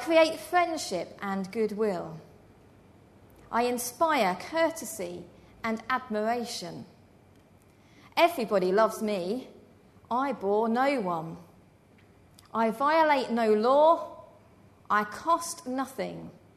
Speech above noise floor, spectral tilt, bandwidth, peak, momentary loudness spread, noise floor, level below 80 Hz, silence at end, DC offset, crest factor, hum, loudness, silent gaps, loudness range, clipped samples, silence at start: 31 dB; -4 dB/octave; 13.5 kHz; -10 dBFS; 14 LU; -58 dBFS; -68 dBFS; 0.25 s; under 0.1%; 20 dB; none; -28 LUFS; none; 6 LU; under 0.1%; 0 s